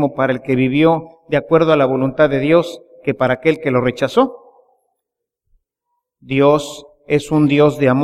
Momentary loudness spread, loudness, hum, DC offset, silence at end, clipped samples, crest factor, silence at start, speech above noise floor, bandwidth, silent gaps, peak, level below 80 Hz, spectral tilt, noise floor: 9 LU; -15 LUFS; none; under 0.1%; 0 s; under 0.1%; 16 dB; 0 s; 65 dB; 13.5 kHz; none; 0 dBFS; -50 dBFS; -7 dB/octave; -79 dBFS